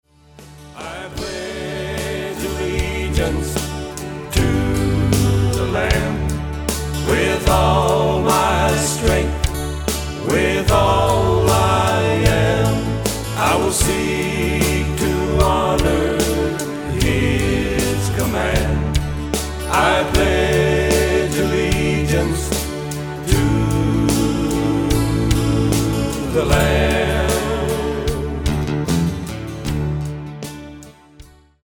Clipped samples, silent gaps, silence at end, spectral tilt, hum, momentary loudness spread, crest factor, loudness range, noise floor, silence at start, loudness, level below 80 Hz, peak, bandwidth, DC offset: under 0.1%; none; 0.4 s; -5 dB/octave; none; 9 LU; 16 dB; 5 LU; -44 dBFS; 0.4 s; -18 LUFS; -26 dBFS; -2 dBFS; over 20 kHz; under 0.1%